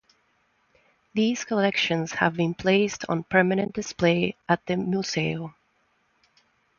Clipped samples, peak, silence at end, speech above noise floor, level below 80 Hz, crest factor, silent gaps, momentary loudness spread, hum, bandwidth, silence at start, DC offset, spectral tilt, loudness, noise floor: under 0.1%; -6 dBFS; 1.3 s; 44 dB; -60 dBFS; 20 dB; none; 7 LU; none; 7.2 kHz; 1.15 s; under 0.1%; -5 dB/octave; -25 LUFS; -68 dBFS